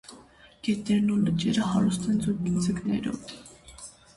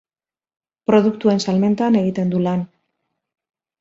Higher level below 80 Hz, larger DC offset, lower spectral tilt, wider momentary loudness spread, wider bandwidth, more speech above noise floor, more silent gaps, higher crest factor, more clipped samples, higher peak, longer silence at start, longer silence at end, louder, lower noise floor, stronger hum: first, -54 dBFS vs -60 dBFS; neither; about the same, -6 dB/octave vs -7 dB/octave; first, 20 LU vs 9 LU; first, 11.5 kHz vs 8 kHz; second, 27 dB vs over 73 dB; neither; about the same, 14 dB vs 18 dB; neither; second, -14 dBFS vs -2 dBFS; second, 0.1 s vs 0.9 s; second, 0.25 s vs 1.15 s; second, -27 LUFS vs -18 LUFS; second, -53 dBFS vs under -90 dBFS; neither